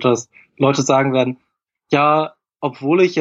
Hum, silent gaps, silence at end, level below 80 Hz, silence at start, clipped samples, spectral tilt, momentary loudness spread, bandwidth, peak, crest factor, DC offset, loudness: none; none; 0 s; -64 dBFS; 0 s; under 0.1%; -5.5 dB/octave; 12 LU; 8 kHz; -2 dBFS; 16 dB; under 0.1%; -17 LUFS